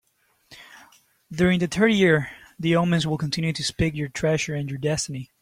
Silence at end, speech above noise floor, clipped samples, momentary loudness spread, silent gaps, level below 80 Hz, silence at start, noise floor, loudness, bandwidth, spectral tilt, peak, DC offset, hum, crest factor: 0.15 s; 40 dB; under 0.1%; 9 LU; none; -48 dBFS; 0.5 s; -62 dBFS; -23 LUFS; 15 kHz; -5.5 dB/octave; -6 dBFS; under 0.1%; none; 18 dB